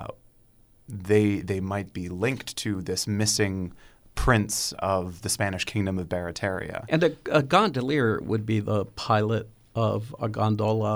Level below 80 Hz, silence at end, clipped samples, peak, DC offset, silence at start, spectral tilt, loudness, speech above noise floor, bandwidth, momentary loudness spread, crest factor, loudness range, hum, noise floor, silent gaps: -44 dBFS; 0 s; under 0.1%; -6 dBFS; under 0.1%; 0 s; -5 dB/octave; -26 LUFS; 33 dB; over 20 kHz; 9 LU; 20 dB; 2 LU; none; -58 dBFS; none